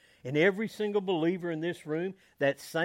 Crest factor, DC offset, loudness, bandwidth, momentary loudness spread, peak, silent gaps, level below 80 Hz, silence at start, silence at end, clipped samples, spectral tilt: 18 dB; under 0.1%; -31 LUFS; 16 kHz; 8 LU; -12 dBFS; none; -78 dBFS; 0.25 s; 0 s; under 0.1%; -6 dB/octave